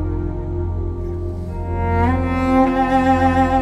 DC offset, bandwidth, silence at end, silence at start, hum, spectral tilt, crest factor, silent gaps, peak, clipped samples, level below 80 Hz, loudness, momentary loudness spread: under 0.1%; 10 kHz; 0 s; 0 s; none; -8 dB/octave; 14 dB; none; -4 dBFS; under 0.1%; -28 dBFS; -19 LUFS; 11 LU